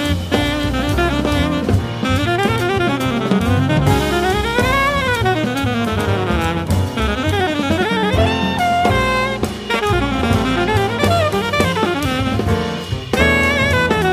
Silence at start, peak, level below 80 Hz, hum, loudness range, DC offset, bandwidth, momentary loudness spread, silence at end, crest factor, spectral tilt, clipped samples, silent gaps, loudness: 0 s; 0 dBFS; -28 dBFS; none; 1 LU; under 0.1%; 15.5 kHz; 4 LU; 0 s; 16 dB; -5.5 dB/octave; under 0.1%; none; -17 LUFS